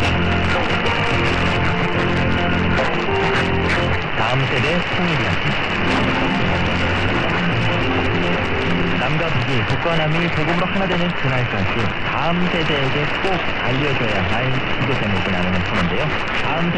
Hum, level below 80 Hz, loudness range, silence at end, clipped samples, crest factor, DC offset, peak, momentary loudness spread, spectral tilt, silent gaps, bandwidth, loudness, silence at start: none; -32 dBFS; 1 LU; 0 s; under 0.1%; 12 dB; under 0.1%; -6 dBFS; 2 LU; -6 dB/octave; none; 9.4 kHz; -18 LUFS; 0 s